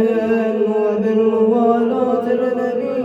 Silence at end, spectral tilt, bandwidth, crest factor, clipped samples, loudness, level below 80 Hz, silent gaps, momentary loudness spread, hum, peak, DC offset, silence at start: 0 s; -8 dB/octave; 7.4 kHz; 14 dB; under 0.1%; -17 LUFS; -60 dBFS; none; 4 LU; none; -2 dBFS; under 0.1%; 0 s